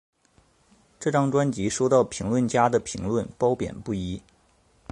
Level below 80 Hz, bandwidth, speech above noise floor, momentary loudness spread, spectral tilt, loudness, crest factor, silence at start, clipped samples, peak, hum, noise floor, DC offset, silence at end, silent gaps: -50 dBFS; 11.5 kHz; 38 dB; 9 LU; -6 dB/octave; -25 LUFS; 20 dB; 1 s; under 0.1%; -6 dBFS; none; -62 dBFS; under 0.1%; 0.7 s; none